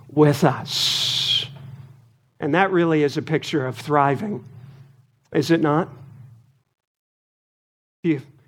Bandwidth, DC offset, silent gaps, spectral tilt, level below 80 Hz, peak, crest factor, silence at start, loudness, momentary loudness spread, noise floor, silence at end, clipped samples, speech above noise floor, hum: 17 kHz; under 0.1%; 6.87-8.03 s; -5 dB/octave; -68 dBFS; -2 dBFS; 22 dB; 0.1 s; -21 LUFS; 12 LU; -54 dBFS; 0.25 s; under 0.1%; 34 dB; none